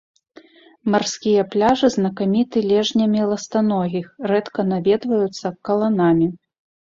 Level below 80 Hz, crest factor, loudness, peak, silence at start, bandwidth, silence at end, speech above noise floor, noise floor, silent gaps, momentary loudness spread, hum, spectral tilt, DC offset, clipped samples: -56 dBFS; 16 dB; -19 LUFS; -4 dBFS; 0.85 s; 7.8 kHz; 0.45 s; 30 dB; -48 dBFS; none; 6 LU; none; -6 dB/octave; under 0.1%; under 0.1%